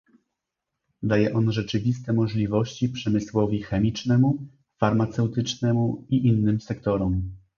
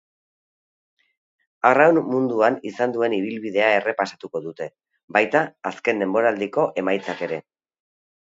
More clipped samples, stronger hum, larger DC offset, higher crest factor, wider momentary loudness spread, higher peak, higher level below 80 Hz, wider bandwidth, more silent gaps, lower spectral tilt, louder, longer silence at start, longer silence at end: neither; neither; neither; about the same, 20 dB vs 22 dB; second, 6 LU vs 13 LU; second, -4 dBFS vs 0 dBFS; first, -46 dBFS vs -72 dBFS; about the same, 7.2 kHz vs 7.8 kHz; second, none vs 5.03-5.08 s; first, -7.5 dB/octave vs -6 dB/octave; second, -24 LUFS vs -21 LUFS; second, 1 s vs 1.65 s; second, 0.2 s vs 0.85 s